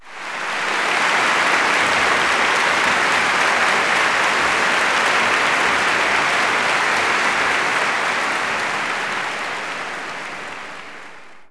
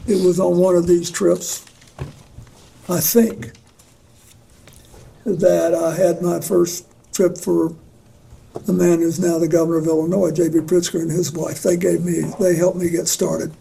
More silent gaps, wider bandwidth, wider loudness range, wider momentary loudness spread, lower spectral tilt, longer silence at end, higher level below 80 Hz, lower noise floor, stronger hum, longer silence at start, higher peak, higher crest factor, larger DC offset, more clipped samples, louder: neither; second, 11 kHz vs 16 kHz; about the same, 6 LU vs 5 LU; about the same, 12 LU vs 14 LU; second, -1 dB/octave vs -5.5 dB/octave; about the same, 0.05 s vs 0.05 s; second, -56 dBFS vs -50 dBFS; second, -41 dBFS vs -50 dBFS; neither; about the same, 0 s vs 0 s; second, -4 dBFS vs 0 dBFS; about the same, 14 dB vs 18 dB; neither; neither; about the same, -17 LUFS vs -18 LUFS